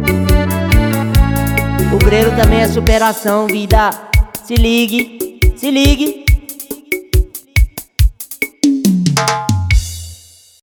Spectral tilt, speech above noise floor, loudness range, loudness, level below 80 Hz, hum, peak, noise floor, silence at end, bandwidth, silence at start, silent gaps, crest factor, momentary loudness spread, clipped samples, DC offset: -5.5 dB/octave; 28 dB; 3 LU; -14 LUFS; -18 dBFS; none; 0 dBFS; -40 dBFS; 0.45 s; over 20 kHz; 0 s; none; 12 dB; 8 LU; under 0.1%; under 0.1%